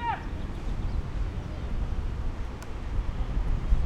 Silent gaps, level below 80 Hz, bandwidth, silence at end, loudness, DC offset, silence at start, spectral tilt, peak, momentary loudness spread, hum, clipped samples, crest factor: none; -30 dBFS; 8.4 kHz; 0 s; -35 LUFS; under 0.1%; 0 s; -7 dB/octave; -10 dBFS; 5 LU; none; under 0.1%; 18 dB